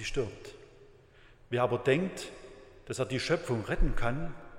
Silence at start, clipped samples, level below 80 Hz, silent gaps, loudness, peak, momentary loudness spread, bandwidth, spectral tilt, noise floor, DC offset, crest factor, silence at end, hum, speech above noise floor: 0 s; under 0.1%; -38 dBFS; none; -32 LUFS; -12 dBFS; 20 LU; 12.5 kHz; -5.5 dB/octave; -58 dBFS; under 0.1%; 20 dB; 0 s; none; 28 dB